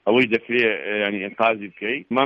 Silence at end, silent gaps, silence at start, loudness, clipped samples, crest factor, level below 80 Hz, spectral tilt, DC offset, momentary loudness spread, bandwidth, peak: 0 s; none; 0.05 s; -21 LUFS; under 0.1%; 16 dB; -66 dBFS; -6.5 dB/octave; under 0.1%; 8 LU; 7.2 kHz; -4 dBFS